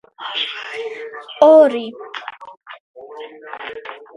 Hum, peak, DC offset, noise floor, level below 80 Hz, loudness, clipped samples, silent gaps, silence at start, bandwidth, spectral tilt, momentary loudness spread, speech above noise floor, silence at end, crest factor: none; 0 dBFS; under 0.1%; -35 dBFS; -74 dBFS; -15 LUFS; under 0.1%; 2.80-2.94 s; 0.2 s; 7 kHz; -4 dB/octave; 25 LU; 21 dB; 0.2 s; 18 dB